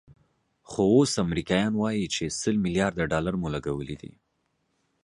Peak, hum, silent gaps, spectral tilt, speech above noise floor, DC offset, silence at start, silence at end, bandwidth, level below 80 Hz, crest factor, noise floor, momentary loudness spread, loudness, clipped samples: -8 dBFS; none; none; -5 dB/octave; 49 dB; under 0.1%; 0.1 s; 0.95 s; 11.5 kHz; -50 dBFS; 18 dB; -74 dBFS; 12 LU; -26 LUFS; under 0.1%